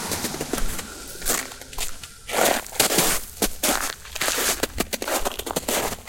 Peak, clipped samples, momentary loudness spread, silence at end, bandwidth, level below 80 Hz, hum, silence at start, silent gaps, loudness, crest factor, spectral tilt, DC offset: -2 dBFS; under 0.1%; 11 LU; 0 s; 17 kHz; -38 dBFS; none; 0 s; none; -24 LUFS; 22 dB; -1.5 dB/octave; under 0.1%